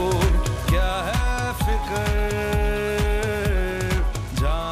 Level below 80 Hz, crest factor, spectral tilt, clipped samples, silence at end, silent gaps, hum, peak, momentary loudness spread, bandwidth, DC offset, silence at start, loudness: -24 dBFS; 12 dB; -5.5 dB/octave; under 0.1%; 0 s; none; none; -10 dBFS; 3 LU; 15.5 kHz; under 0.1%; 0 s; -23 LUFS